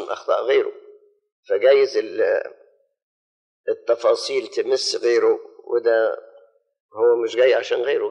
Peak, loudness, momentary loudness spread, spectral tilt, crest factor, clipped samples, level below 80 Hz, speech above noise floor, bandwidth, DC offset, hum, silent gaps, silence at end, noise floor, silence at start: -4 dBFS; -20 LUFS; 9 LU; -2 dB/octave; 16 dB; under 0.1%; -84 dBFS; 34 dB; 10.5 kHz; under 0.1%; none; 1.32-1.43 s, 3.02-3.64 s, 6.80-6.89 s; 0 s; -53 dBFS; 0 s